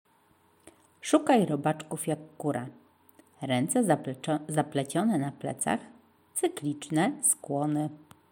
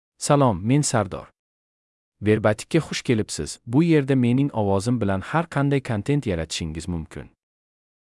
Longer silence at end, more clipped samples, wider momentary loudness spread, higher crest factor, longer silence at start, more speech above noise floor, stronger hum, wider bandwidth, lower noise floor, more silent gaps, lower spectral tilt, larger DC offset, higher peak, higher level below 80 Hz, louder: second, 0.35 s vs 0.85 s; neither; about the same, 10 LU vs 11 LU; about the same, 20 dB vs 16 dB; first, 1.05 s vs 0.2 s; second, 36 dB vs over 68 dB; neither; first, 17 kHz vs 12 kHz; second, -65 dBFS vs under -90 dBFS; second, none vs 1.39-2.12 s; second, -4.5 dB/octave vs -6 dB/octave; neither; second, -10 dBFS vs -6 dBFS; second, -78 dBFS vs -50 dBFS; second, -29 LUFS vs -22 LUFS